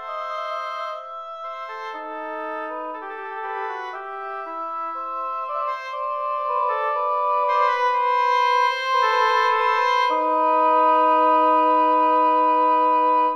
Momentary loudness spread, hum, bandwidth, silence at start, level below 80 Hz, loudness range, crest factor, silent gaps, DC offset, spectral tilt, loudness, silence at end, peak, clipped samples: 15 LU; none; 6.6 kHz; 0 s; -82 dBFS; 13 LU; 12 dB; none; under 0.1%; -1 dB/octave; -21 LUFS; 0 s; -8 dBFS; under 0.1%